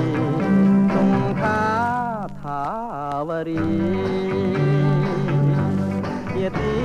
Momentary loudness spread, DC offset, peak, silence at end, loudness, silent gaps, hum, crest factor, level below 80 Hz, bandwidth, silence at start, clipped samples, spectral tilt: 9 LU; under 0.1%; -8 dBFS; 0 s; -21 LUFS; none; none; 12 dB; -44 dBFS; 9 kHz; 0 s; under 0.1%; -8.5 dB/octave